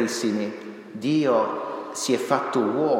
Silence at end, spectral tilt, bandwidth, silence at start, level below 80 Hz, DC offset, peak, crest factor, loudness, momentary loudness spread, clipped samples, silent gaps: 0 s; -4.5 dB/octave; 16.5 kHz; 0 s; -80 dBFS; under 0.1%; -6 dBFS; 18 dB; -24 LUFS; 11 LU; under 0.1%; none